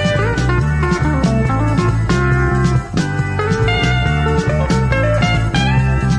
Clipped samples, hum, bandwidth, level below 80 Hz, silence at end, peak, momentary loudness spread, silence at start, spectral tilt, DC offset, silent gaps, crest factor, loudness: under 0.1%; none; 10 kHz; -22 dBFS; 0 s; -2 dBFS; 2 LU; 0 s; -6.5 dB/octave; under 0.1%; none; 12 dB; -15 LUFS